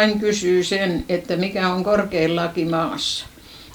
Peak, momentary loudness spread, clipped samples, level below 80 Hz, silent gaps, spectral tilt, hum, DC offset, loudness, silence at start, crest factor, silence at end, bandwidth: -4 dBFS; 5 LU; under 0.1%; -48 dBFS; none; -4.5 dB/octave; none; under 0.1%; -21 LUFS; 0 s; 18 dB; 0 s; over 20 kHz